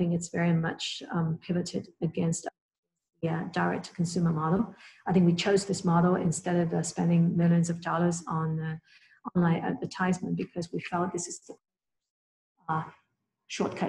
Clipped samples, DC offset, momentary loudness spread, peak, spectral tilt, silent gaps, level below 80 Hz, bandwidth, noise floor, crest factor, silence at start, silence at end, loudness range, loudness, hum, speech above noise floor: under 0.1%; under 0.1%; 11 LU; -12 dBFS; -6 dB/octave; 2.61-2.69 s, 2.78-2.83 s, 12.10-12.55 s; -64 dBFS; 11 kHz; -71 dBFS; 18 dB; 0 s; 0 s; 8 LU; -29 LUFS; none; 43 dB